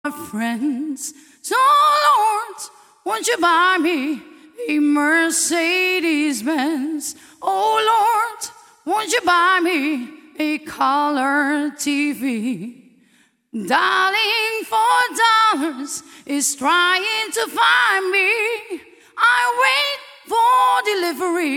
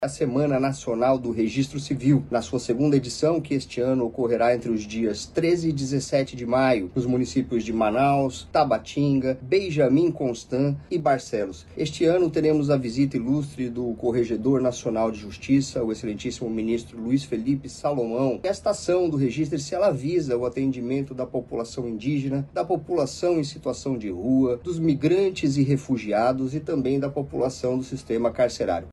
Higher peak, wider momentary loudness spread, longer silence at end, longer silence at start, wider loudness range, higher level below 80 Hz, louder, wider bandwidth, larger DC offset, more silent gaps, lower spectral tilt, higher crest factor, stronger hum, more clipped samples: first, -2 dBFS vs -8 dBFS; first, 15 LU vs 7 LU; about the same, 0 s vs 0 s; about the same, 0.05 s vs 0 s; about the same, 3 LU vs 3 LU; second, -70 dBFS vs -52 dBFS; first, -17 LUFS vs -24 LUFS; first, 17 kHz vs 11.5 kHz; neither; neither; second, -1.5 dB/octave vs -6.5 dB/octave; about the same, 16 dB vs 16 dB; neither; neither